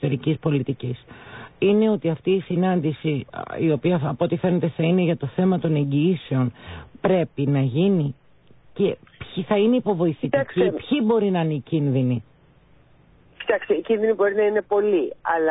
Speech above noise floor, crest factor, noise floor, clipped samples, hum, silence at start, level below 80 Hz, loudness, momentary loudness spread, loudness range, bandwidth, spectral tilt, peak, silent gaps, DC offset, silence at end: 33 dB; 14 dB; -54 dBFS; under 0.1%; none; 0 s; -56 dBFS; -22 LUFS; 10 LU; 2 LU; 4 kHz; -12.5 dB/octave; -8 dBFS; none; under 0.1%; 0 s